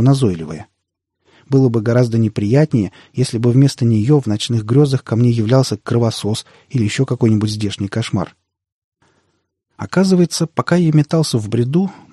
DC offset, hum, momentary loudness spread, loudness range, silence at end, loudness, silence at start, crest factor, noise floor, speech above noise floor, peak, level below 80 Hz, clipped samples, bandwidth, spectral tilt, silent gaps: under 0.1%; none; 8 LU; 5 LU; 0.2 s; -16 LUFS; 0 s; 14 dB; -75 dBFS; 60 dB; -2 dBFS; -52 dBFS; under 0.1%; 12.5 kHz; -7 dB/octave; 8.72-8.92 s